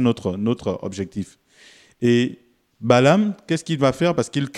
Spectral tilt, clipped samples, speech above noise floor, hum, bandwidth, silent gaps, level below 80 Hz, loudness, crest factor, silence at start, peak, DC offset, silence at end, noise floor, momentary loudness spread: -6 dB/octave; under 0.1%; 31 dB; none; 12 kHz; none; -58 dBFS; -21 LUFS; 18 dB; 0 s; -2 dBFS; under 0.1%; 0 s; -51 dBFS; 13 LU